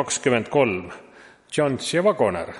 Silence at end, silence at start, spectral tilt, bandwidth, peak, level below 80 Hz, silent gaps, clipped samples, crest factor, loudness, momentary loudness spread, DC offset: 0 s; 0 s; -4 dB/octave; 11.5 kHz; -4 dBFS; -58 dBFS; none; under 0.1%; 18 dB; -22 LUFS; 12 LU; under 0.1%